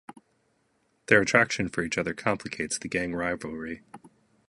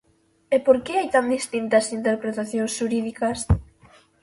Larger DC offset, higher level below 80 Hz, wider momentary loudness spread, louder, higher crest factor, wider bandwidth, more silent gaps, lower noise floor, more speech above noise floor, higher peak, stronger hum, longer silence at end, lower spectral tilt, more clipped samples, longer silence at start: neither; second, -56 dBFS vs -38 dBFS; first, 16 LU vs 7 LU; second, -26 LUFS vs -23 LUFS; first, 26 dB vs 20 dB; about the same, 11.5 kHz vs 11.5 kHz; neither; first, -71 dBFS vs -54 dBFS; first, 43 dB vs 32 dB; about the same, -4 dBFS vs -4 dBFS; neither; second, 0.4 s vs 0.6 s; second, -4 dB/octave vs -5.5 dB/octave; neither; first, 1.1 s vs 0.5 s